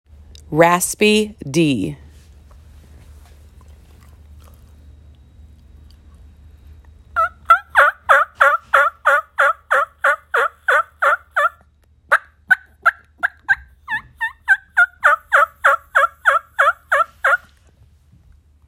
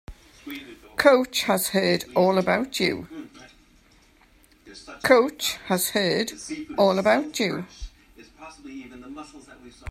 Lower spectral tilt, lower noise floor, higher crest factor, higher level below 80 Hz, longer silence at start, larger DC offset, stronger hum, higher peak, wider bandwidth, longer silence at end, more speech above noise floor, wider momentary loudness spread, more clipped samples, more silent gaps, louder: about the same, -3.5 dB/octave vs -4 dB/octave; second, -53 dBFS vs -57 dBFS; second, 18 dB vs 24 dB; about the same, -48 dBFS vs -52 dBFS; first, 0.5 s vs 0.1 s; neither; neither; about the same, 0 dBFS vs -2 dBFS; about the same, 16 kHz vs 16 kHz; first, 1.3 s vs 0 s; about the same, 37 dB vs 34 dB; second, 9 LU vs 24 LU; neither; neither; first, -16 LUFS vs -22 LUFS